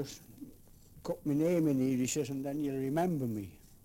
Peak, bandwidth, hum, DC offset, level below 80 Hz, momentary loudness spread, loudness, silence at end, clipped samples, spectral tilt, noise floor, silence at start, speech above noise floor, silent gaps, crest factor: -20 dBFS; 17 kHz; none; under 0.1%; -62 dBFS; 19 LU; -33 LUFS; 0.3 s; under 0.1%; -6 dB/octave; -56 dBFS; 0 s; 24 dB; none; 14 dB